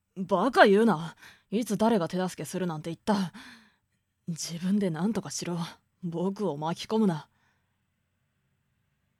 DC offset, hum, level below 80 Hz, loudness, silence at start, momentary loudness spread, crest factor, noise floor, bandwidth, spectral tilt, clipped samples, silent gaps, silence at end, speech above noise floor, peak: under 0.1%; none; -68 dBFS; -28 LUFS; 0.15 s; 16 LU; 24 dB; -76 dBFS; 15 kHz; -5.5 dB/octave; under 0.1%; none; 1.95 s; 49 dB; -4 dBFS